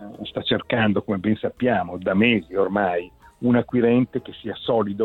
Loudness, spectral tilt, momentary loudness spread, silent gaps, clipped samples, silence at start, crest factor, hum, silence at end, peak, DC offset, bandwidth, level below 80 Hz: -22 LUFS; -8.5 dB/octave; 10 LU; none; under 0.1%; 0 s; 16 dB; none; 0 s; -6 dBFS; under 0.1%; 4.3 kHz; -54 dBFS